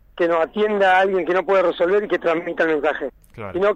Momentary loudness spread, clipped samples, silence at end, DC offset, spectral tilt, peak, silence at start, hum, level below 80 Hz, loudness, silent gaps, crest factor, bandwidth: 11 LU; under 0.1%; 0 s; under 0.1%; -6 dB/octave; -6 dBFS; 0.15 s; none; -52 dBFS; -19 LUFS; none; 14 dB; 9 kHz